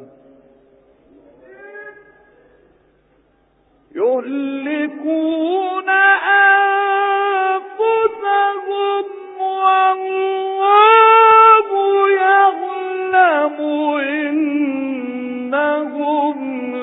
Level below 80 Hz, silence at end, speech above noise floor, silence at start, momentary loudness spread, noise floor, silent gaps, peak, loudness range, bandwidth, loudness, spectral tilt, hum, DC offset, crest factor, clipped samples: -66 dBFS; 0 s; 38 dB; 0 s; 14 LU; -57 dBFS; none; 0 dBFS; 12 LU; 4 kHz; -15 LUFS; -6.5 dB/octave; none; under 0.1%; 16 dB; under 0.1%